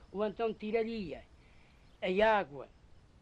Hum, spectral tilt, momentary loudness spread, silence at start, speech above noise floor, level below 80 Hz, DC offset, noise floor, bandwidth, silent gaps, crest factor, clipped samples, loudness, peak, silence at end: none; -6.5 dB/octave; 20 LU; 0 s; 27 dB; -60 dBFS; under 0.1%; -60 dBFS; 8.4 kHz; none; 18 dB; under 0.1%; -34 LUFS; -18 dBFS; 0.55 s